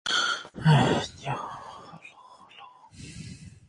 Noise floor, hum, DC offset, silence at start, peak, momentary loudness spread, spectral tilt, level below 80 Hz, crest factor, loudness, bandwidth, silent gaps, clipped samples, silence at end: -52 dBFS; none; under 0.1%; 0.05 s; -8 dBFS; 27 LU; -5 dB/octave; -56 dBFS; 20 dB; -25 LUFS; 11 kHz; none; under 0.1%; 0.2 s